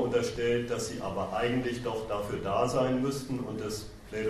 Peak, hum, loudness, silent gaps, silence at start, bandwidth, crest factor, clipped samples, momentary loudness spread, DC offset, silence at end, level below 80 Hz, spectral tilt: -14 dBFS; none; -31 LUFS; none; 0 s; 14 kHz; 16 dB; under 0.1%; 8 LU; under 0.1%; 0 s; -52 dBFS; -5.5 dB/octave